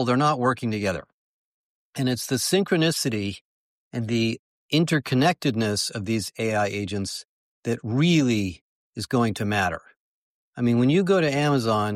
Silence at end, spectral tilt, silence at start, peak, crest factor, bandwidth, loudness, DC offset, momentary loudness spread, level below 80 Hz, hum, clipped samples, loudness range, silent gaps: 0 s; -5 dB/octave; 0 s; -8 dBFS; 16 dB; 15.5 kHz; -24 LUFS; under 0.1%; 14 LU; -58 dBFS; none; under 0.1%; 2 LU; 1.13-1.93 s, 3.41-3.91 s, 4.39-4.69 s, 7.25-7.63 s, 8.61-8.93 s, 9.96-10.53 s